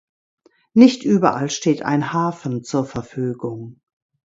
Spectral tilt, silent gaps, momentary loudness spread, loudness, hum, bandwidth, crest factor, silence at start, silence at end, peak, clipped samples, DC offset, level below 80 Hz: -6 dB/octave; none; 15 LU; -19 LUFS; none; 7.8 kHz; 20 dB; 0.75 s; 0.65 s; 0 dBFS; under 0.1%; under 0.1%; -58 dBFS